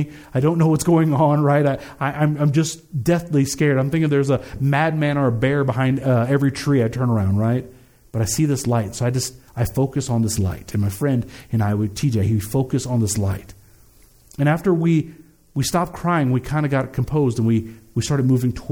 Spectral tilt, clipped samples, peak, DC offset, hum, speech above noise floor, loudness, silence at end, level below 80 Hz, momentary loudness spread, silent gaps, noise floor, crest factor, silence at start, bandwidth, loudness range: -6.5 dB/octave; under 0.1%; -6 dBFS; under 0.1%; none; 32 dB; -20 LUFS; 0 s; -44 dBFS; 7 LU; none; -51 dBFS; 14 dB; 0 s; over 20 kHz; 3 LU